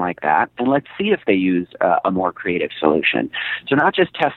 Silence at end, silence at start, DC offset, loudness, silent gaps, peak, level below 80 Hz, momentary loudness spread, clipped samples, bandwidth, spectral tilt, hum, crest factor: 0 s; 0 s; under 0.1%; -18 LUFS; none; 0 dBFS; -58 dBFS; 5 LU; under 0.1%; 4.3 kHz; -8.5 dB/octave; none; 18 dB